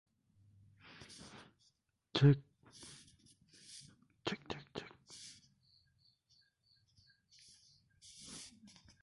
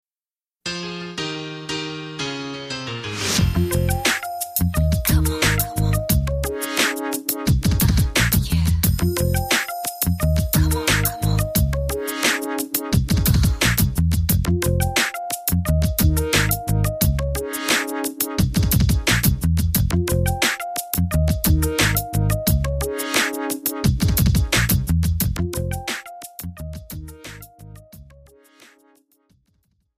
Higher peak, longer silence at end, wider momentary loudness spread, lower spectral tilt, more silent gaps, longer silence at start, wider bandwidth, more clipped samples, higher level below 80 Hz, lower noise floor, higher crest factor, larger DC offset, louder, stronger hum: second, -16 dBFS vs -4 dBFS; second, 0.6 s vs 1.95 s; first, 30 LU vs 10 LU; first, -6 dB/octave vs -4.5 dB/octave; neither; first, 2.15 s vs 0.65 s; second, 11.5 kHz vs 16 kHz; neither; second, -68 dBFS vs -28 dBFS; second, -78 dBFS vs under -90 dBFS; first, 26 dB vs 18 dB; neither; second, -37 LUFS vs -20 LUFS; neither